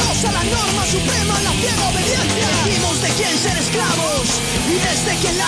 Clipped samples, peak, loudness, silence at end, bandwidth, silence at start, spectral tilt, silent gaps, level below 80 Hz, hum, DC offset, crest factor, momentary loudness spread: under 0.1%; -4 dBFS; -16 LUFS; 0 s; 11 kHz; 0 s; -3 dB/octave; none; -32 dBFS; none; under 0.1%; 14 dB; 1 LU